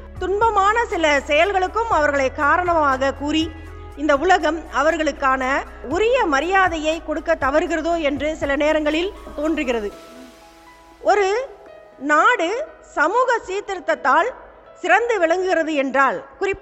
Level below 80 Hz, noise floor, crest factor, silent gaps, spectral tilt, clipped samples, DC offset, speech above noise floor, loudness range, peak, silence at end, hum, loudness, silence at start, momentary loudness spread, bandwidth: -42 dBFS; -46 dBFS; 18 dB; none; -4 dB/octave; under 0.1%; under 0.1%; 27 dB; 4 LU; -2 dBFS; 0 s; none; -19 LUFS; 0 s; 9 LU; 12 kHz